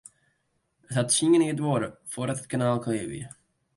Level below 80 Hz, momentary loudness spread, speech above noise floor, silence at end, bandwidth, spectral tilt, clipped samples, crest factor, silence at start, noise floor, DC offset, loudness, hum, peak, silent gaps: -64 dBFS; 14 LU; 48 dB; 0.5 s; 11.5 kHz; -5 dB/octave; under 0.1%; 18 dB; 0.9 s; -74 dBFS; under 0.1%; -26 LUFS; none; -10 dBFS; none